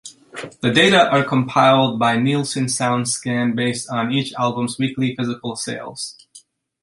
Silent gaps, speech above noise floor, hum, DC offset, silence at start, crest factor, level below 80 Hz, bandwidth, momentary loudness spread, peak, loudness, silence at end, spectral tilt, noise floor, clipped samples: none; 31 dB; none; under 0.1%; 0.05 s; 18 dB; -58 dBFS; 11.5 kHz; 14 LU; -2 dBFS; -18 LUFS; 0.45 s; -4.5 dB/octave; -49 dBFS; under 0.1%